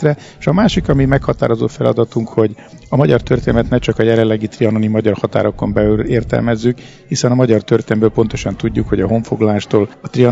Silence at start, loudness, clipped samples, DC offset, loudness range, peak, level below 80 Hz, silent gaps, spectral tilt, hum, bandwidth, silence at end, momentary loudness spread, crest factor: 0 s; -15 LUFS; 0.2%; under 0.1%; 1 LU; 0 dBFS; -32 dBFS; none; -7 dB/octave; none; 7.8 kHz; 0 s; 5 LU; 14 dB